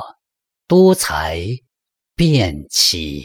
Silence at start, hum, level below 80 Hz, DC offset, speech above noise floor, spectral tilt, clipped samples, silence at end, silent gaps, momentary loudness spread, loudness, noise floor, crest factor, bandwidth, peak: 0 s; none; -40 dBFS; under 0.1%; 67 dB; -4.5 dB/octave; under 0.1%; 0 s; none; 15 LU; -15 LUFS; -82 dBFS; 16 dB; 19.5 kHz; -2 dBFS